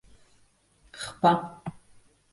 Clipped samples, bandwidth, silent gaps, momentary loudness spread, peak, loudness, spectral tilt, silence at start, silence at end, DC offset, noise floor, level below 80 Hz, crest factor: under 0.1%; 11.5 kHz; none; 19 LU; -8 dBFS; -27 LUFS; -5.5 dB/octave; 0.95 s; 0.6 s; under 0.1%; -63 dBFS; -62 dBFS; 22 dB